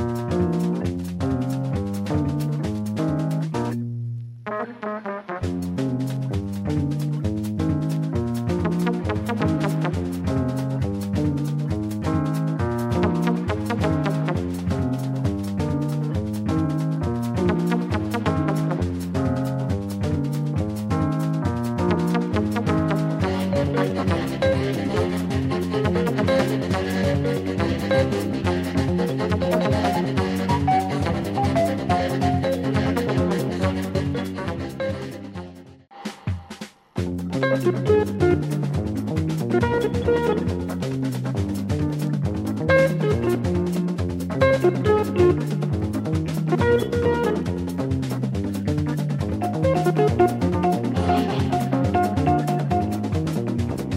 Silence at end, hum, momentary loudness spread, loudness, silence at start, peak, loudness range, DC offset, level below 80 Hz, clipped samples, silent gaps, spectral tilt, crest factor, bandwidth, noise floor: 0 s; none; 6 LU; -23 LUFS; 0 s; -4 dBFS; 5 LU; under 0.1%; -42 dBFS; under 0.1%; none; -7.5 dB/octave; 18 dB; 16 kHz; -44 dBFS